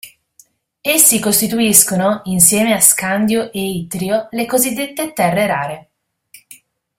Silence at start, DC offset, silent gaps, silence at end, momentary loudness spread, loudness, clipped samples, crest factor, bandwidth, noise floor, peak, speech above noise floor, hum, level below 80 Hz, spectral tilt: 0.05 s; under 0.1%; none; 0.45 s; 12 LU; -13 LUFS; 0.1%; 16 dB; over 20 kHz; -52 dBFS; 0 dBFS; 37 dB; none; -54 dBFS; -3 dB/octave